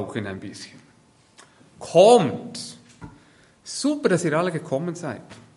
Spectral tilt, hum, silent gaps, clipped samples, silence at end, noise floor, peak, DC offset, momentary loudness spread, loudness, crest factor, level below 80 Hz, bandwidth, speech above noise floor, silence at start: -5 dB/octave; none; none; under 0.1%; 0.2 s; -57 dBFS; -2 dBFS; under 0.1%; 24 LU; -21 LUFS; 22 dB; -62 dBFS; 11.5 kHz; 35 dB; 0 s